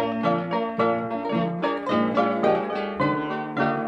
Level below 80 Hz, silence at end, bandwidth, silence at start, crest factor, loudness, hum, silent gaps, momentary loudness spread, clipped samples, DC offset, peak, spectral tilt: -60 dBFS; 0 s; 7.6 kHz; 0 s; 14 dB; -24 LUFS; none; none; 5 LU; under 0.1%; under 0.1%; -10 dBFS; -8 dB/octave